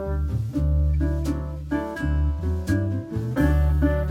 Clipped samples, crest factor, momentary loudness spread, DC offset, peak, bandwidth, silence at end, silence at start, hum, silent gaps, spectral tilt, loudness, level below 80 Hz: under 0.1%; 14 dB; 7 LU; under 0.1%; -8 dBFS; 9.8 kHz; 0 s; 0 s; none; none; -8.5 dB/octave; -24 LUFS; -26 dBFS